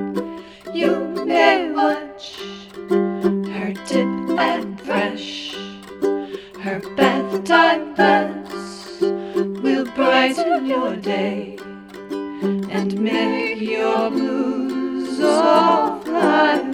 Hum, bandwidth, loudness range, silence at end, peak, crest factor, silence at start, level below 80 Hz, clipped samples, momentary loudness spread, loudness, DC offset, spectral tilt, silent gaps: none; 16 kHz; 4 LU; 0 s; 0 dBFS; 18 dB; 0 s; -60 dBFS; under 0.1%; 16 LU; -19 LUFS; under 0.1%; -5.5 dB/octave; none